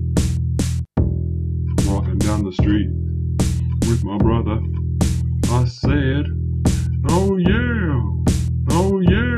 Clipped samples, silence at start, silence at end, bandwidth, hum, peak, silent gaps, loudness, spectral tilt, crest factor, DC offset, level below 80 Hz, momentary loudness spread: under 0.1%; 0 s; 0 s; 13.5 kHz; none; -2 dBFS; none; -19 LUFS; -6.5 dB/octave; 16 dB; under 0.1%; -26 dBFS; 5 LU